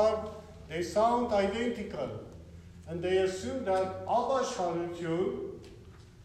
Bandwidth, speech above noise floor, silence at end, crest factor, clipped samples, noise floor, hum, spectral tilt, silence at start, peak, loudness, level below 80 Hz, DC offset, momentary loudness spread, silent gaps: 13 kHz; 21 dB; 0 s; 18 dB; under 0.1%; -52 dBFS; none; -5.5 dB/octave; 0 s; -14 dBFS; -31 LUFS; -58 dBFS; under 0.1%; 20 LU; none